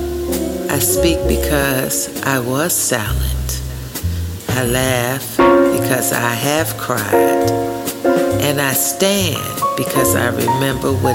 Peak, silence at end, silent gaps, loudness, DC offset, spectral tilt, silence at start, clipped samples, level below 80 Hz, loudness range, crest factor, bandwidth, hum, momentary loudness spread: 0 dBFS; 0 s; none; -16 LUFS; under 0.1%; -4 dB/octave; 0 s; under 0.1%; -30 dBFS; 3 LU; 16 dB; 17 kHz; none; 7 LU